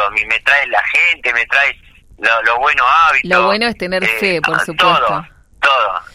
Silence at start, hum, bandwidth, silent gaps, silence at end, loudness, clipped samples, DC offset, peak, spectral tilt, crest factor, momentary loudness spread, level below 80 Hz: 0 s; none; 16 kHz; none; 0.1 s; -12 LUFS; under 0.1%; under 0.1%; 0 dBFS; -3.5 dB/octave; 14 dB; 6 LU; -46 dBFS